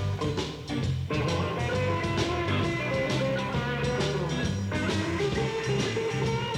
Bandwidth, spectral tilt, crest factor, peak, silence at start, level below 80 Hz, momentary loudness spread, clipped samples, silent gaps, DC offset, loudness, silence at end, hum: 14.5 kHz; -5.5 dB/octave; 14 dB; -14 dBFS; 0 s; -44 dBFS; 3 LU; under 0.1%; none; under 0.1%; -28 LUFS; 0 s; none